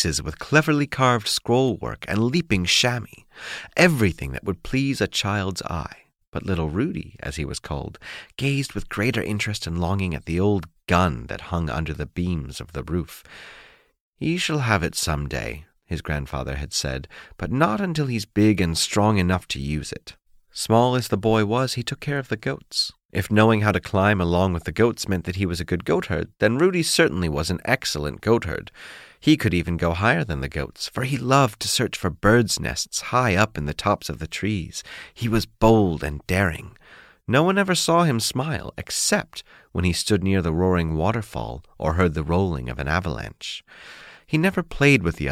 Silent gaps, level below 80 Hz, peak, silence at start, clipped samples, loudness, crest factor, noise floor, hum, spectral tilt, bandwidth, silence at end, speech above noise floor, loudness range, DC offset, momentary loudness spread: 6.27-6.32 s, 14.00-14.13 s, 23.05-23.09 s; -40 dBFS; -4 dBFS; 0 s; under 0.1%; -23 LUFS; 20 dB; -50 dBFS; none; -5 dB/octave; 16 kHz; 0 s; 27 dB; 5 LU; under 0.1%; 14 LU